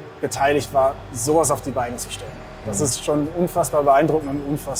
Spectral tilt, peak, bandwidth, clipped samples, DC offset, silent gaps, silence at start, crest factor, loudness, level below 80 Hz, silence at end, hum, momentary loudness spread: -4.5 dB/octave; -6 dBFS; 19.5 kHz; under 0.1%; under 0.1%; none; 0 s; 16 dB; -21 LUFS; -44 dBFS; 0 s; none; 12 LU